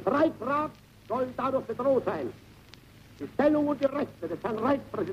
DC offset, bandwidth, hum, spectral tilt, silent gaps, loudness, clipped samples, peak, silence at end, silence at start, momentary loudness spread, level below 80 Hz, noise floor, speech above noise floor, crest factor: under 0.1%; 15 kHz; none; -7.5 dB/octave; none; -29 LUFS; under 0.1%; -12 dBFS; 0 s; 0 s; 10 LU; -60 dBFS; -52 dBFS; 24 dB; 16 dB